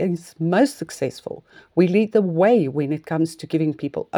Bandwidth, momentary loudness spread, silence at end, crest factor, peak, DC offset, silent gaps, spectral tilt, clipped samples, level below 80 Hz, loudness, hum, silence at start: 19 kHz; 11 LU; 0 s; 16 dB; -4 dBFS; under 0.1%; none; -7 dB/octave; under 0.1%; -66 dBFS; -21 LUFS; none; 0 s